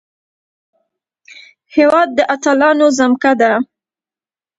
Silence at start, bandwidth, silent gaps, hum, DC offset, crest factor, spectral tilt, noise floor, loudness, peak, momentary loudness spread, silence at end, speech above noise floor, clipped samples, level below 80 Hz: 1.75 s; 8.2 kHz; none; none; under 0.1%; 16 dB; -3.5 dB/octave; under -90 dBFS; -12 LUFS; 0 dBFS; 7 LU; 0.95 s; over 78 dB; under 0.1%; -62 dBFS